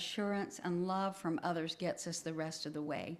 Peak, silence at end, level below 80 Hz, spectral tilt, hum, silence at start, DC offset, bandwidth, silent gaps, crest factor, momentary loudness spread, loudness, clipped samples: -22 dBFS; 0 s; -78 dBFS; -4.5 dB/octave; none; 0 s; under 0.1%; 14 kHz; none; 16 dB; 4 LU; -39 LUFS; under 0.1%